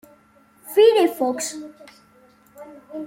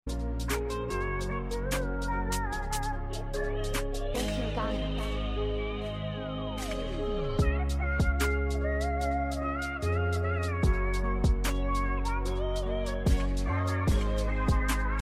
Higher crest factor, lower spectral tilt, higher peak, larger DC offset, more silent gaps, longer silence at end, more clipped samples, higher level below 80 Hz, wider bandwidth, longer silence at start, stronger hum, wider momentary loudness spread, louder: about the same, 18 dB vs 14 dB; second, -2 dB/octave vs -5.5 dB/octave; first, -4 dBFS vs -16 dBFS; neither; neither; about the same, 0 s vs 0 s; neither; second, -72 dBFS vs -32 dBFS; about the same, 16.5 kHz vs 15.5 kHz; first, 0.65 s vs 0.05 s; neither; first, 22 LU vs 6 LU; first, -19 LUFS vs -31 LUFS